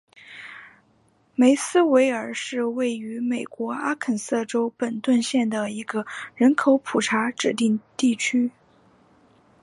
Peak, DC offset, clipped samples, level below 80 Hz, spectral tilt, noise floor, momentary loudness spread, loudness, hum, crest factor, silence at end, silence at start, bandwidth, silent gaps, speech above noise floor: -6 dBFS; under 0.1%; under 0.1%; -74 dBFS; -4 dB/octave; -62 dBFS; 11 LU; -23 LUFS; none; 18 dB; 1.15 s; 0.3 s; 11.5 kHz; none; 40 dB